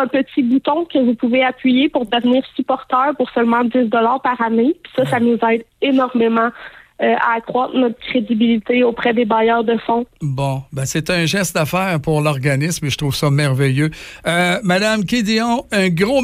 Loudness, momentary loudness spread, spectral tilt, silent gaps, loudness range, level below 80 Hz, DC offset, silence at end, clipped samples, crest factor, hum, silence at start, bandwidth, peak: -16 LUFS; 5 LU; -5.5 dB/octave; none; 1 LU; -48 dBFS; under 0.1%; 0 s; under 0.1%; 12 dB; none; 0 s; 15.5 kHz; -4 dBFS